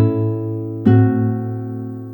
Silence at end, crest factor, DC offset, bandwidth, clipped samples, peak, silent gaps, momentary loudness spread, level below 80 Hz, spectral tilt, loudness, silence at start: 0 s; 16 dB; under 0.1%; 3.5 kHz; under 0.1%; 0 dBFS; none; 13 LU; -58 dBFS; -12 dB/octave; -18 LUFS; 0 s